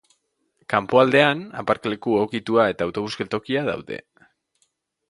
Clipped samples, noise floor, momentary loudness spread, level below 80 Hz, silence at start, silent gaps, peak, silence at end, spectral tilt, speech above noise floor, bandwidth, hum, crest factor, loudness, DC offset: under 0.1%; -70 dBFS; 11 LU; -60 dBFS; 0.7 s; none; 0 dBFS; 1.15 s; -6 dB/octave; 48 dB; 11.5 kHz; none; 22 dB; -21 LUFS; under 0.1%